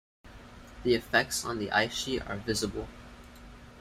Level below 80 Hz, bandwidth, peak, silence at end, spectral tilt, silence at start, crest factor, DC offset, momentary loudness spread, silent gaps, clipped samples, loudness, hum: -50 dBFS; 16 kHz; -10 dBFS; 0 s; -3.5 dB/octave; 0.25 s; 22 dB; under 0.1%; 24 LU; none; under 0.1%; -30 LUFS; none